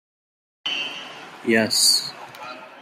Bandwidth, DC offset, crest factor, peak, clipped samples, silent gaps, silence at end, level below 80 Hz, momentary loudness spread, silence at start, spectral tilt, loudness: 16 kHz; under 0.1%; 18 dB; -6 dBFS; under 0.1%; none; 0 s; -74 dBFS; 21 LU; 0.65 s; -1 dB/octave; -20 LUFS